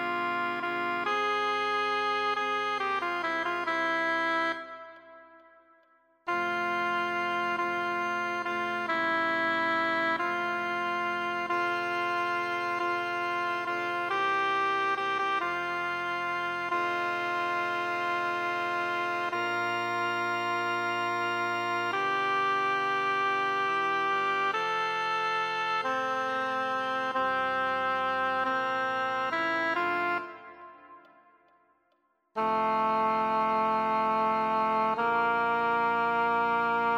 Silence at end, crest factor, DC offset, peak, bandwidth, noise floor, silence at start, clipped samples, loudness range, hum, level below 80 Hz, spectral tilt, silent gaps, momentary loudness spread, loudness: 0 s; 12 dB; under 0.1%; -18 dBFS; 16 kHz; -73 dBFS; 0 s; under 0.1%; 4 LU; none; -70 dBFS; -4 dB/octave; none; 4 LU; -28 LUFS